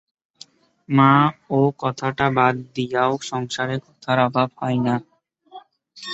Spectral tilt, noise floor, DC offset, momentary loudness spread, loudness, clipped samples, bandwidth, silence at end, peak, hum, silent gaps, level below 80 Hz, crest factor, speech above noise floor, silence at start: -6.5 dB/octave; -49 dBFS; under 0.1%; 11 LU; -20 LUFS; under 0.1%; 8 kHz; 0 s; -2 dBFS; none; none; -58 dBFS; 20 dB; 29 dB; 0.9 s